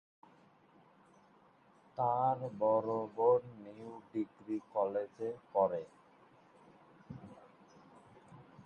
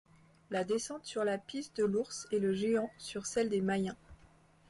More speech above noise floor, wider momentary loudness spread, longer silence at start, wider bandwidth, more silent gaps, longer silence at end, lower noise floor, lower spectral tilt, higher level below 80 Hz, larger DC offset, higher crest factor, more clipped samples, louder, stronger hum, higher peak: about the same, 31 dB vs 29 dB; first, 21 LU vs 8 LU; first, 1.95 s vs 0.5 s; second, 6.6 kHz vs 11.5 kHz; neither; second, 0.05 s vs 0.55 s; about the same, -66 dBFS vs -63 dBFS; first, -9 dB/octave vs -5 dB/octave; second, -78 dBFS vs -68 dBFS; neither; first, 20 dB vs 14 dB; neither; about the same, -35 LUFS vs -35 LUFS; neither; first, -18 dBFS vs -22 dBFS